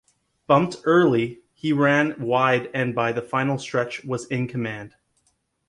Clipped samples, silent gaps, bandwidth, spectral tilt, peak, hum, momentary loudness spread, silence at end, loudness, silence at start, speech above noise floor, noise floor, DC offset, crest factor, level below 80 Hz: under 0.1%; none; 11.5 kHz; -6.5 dB/octave; -4 dBFS; none; 11 LU; 0.8 s; -22 LUFS; 0.5 s; 47 dB; -69 dBFS; under 0.1%; 20 dB; -62 dBFS